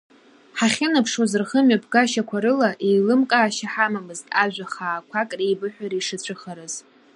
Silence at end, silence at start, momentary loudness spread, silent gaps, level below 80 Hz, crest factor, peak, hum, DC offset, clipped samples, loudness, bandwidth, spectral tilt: 0.35 s; 0.55 s; 13 LU; none; -72 dBFS; 18 dB; -4 dBFS; none; under 0.1%; under 0.1%; -21 LUFS; 11.5 kHz; -4 dB/octave